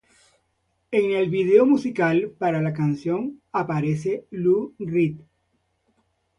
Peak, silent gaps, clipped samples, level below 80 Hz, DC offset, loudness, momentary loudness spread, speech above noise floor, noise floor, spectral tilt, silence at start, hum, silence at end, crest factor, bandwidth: -4 dBFS; none; under 0.1%; -62 dBFS; under 0.1%; -22 LUFS; 10 LU; 50 dB; -71 dBFS; -8 dB/octave; 0.9 s; none; 1.2 s; 18 dB; 10.5 kHz